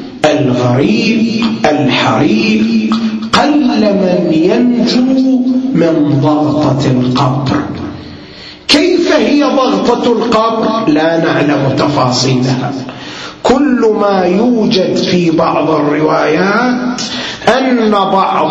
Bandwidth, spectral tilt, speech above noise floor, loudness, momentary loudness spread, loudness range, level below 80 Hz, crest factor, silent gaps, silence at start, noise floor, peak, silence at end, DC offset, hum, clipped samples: 11 kHz; -6 dB/octave; 21 dB; -11 LUFS; 6 LU; 2 LU; -44 dBFS; 10 dB; none; 0 s; -31 dBFS; 0 dBFS; 0 s; under 0.1%; none; under 0.1%